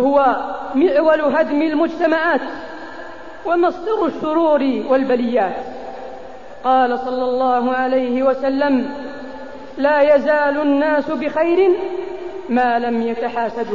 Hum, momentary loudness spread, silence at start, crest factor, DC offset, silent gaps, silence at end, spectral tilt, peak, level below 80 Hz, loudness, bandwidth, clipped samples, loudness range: none; 17 LU; 0 s; 14 dB; 1%; none; 0 s; -6.5 dB/octave; -4 dBFS; -52 dBFS; -17 LUFS; 7.2 kHz; under 0.1%; 2 LU